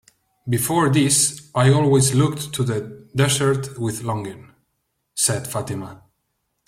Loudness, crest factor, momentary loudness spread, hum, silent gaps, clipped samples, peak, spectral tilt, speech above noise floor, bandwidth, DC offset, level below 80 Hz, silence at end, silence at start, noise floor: -20 LUFS; 18 dB; 14 LU; none; none; under 0.1%; -4 dBFS; -4.5 dB/octave; 53 dB; 16 kHz; under 0.1%; -54 dBFS; 0.7 s; 0.45 s; -73 dBFS